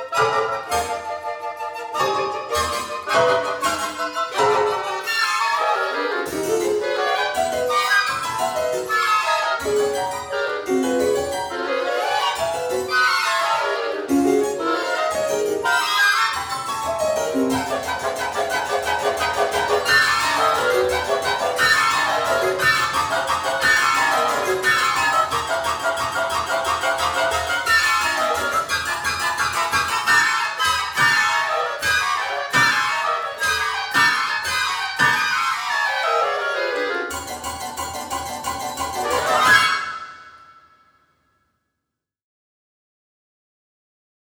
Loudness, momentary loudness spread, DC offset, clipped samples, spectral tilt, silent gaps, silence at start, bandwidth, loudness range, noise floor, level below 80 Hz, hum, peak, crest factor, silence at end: -20 LUFS; 8 LU; under 0.1%; under 0.1%; -2 dB/octave; none; 0 s; over 20 kHz; 4 LU; -82 dBFS; -50 dBFS; none; -4 dBFS; 18 dB; 3.85 s